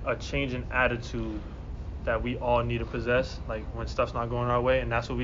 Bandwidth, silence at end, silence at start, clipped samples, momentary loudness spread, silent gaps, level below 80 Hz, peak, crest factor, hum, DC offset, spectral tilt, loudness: 7.4 kHz; 0 s; 0 s; under 0.1%; 10 LU; none; -38 dBFS; -12 dBFS; 16 dB; none; under 0.1%; -5 dB/octave; -29 LUFS